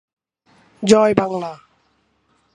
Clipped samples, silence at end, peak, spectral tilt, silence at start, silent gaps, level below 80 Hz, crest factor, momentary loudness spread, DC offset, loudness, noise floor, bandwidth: under 0.1%; 1 s; 0 dBFS; -5 dB/octave; 0.8 s; none; -58 dBFS; 20 dB; 14 LU; under 0.1%; -17 LUFS; -63 dBFS; 11 kHz